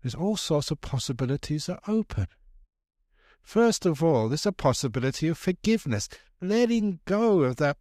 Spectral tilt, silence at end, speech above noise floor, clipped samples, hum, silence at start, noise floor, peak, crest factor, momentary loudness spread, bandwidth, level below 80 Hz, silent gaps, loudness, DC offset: -5.5 dB/octave; 0.05 s; 37 dB; under 0.1%; none; 0.05 s; -63 dBFS; -10 dBFS; 16 dB; 8 LU; 15 kHz; -50 dBFS; none; -26 LUFS; under 0.1%